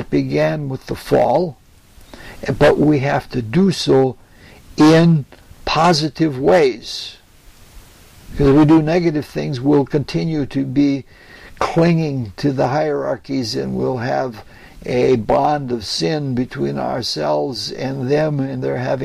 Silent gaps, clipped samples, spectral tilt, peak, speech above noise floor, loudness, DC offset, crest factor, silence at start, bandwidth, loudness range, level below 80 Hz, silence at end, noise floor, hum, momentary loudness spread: none; under 0.1%; -6.5 dB/octave; -4 dBFS; 29 dB; -17 LUFS; under 0.1%; 14 dB; 0 s; 14 kHz; 4 LU; -40 dBFS; 0 s; -45 dBFS; none; 13 LU